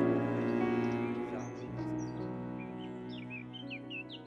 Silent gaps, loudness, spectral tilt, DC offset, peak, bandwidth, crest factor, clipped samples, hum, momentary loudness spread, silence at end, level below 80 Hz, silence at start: none; -37 LUFS; -7.5 dB/octave; under 0.1%; -18 dBFS; 7.8 kHz; 18 dB; under 0.1%; none; 11 LU; 0 s; -64 dBFS; 0 s